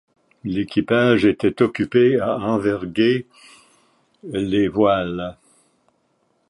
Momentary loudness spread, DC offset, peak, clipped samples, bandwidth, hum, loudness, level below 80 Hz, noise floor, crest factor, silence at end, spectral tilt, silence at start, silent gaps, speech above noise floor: 12 LU; under 0.1%; -2 dBFS; under 0.1%; 11 kHz; none; -19 LUFS; -52 dBFS; -66 dBFS; 18 dB; 1.15 s; -7.5 dB/octave; 0.45 s; none; 47 dB